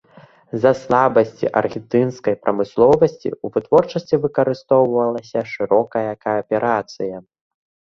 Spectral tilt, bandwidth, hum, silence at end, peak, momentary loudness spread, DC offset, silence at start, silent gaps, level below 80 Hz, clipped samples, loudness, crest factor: -7.5 dB/octave; 7.2 kHz; none; 0.75 s; 0 dBFS; 10 LU; under 0.1%; 0.55 s; none; -56 dBFS; under 0.1%; -18 LUFS; 18 dB